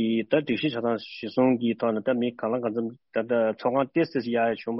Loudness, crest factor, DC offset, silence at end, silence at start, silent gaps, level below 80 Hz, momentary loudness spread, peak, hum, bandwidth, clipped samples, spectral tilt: -26 LUFS; 16 dB; under 0.1%; 0 s; 0 s; none; -68 dBFS; 7 LU; -10 dBFS; none; 5.8 kHz; under 0.1%; -5 dB/octave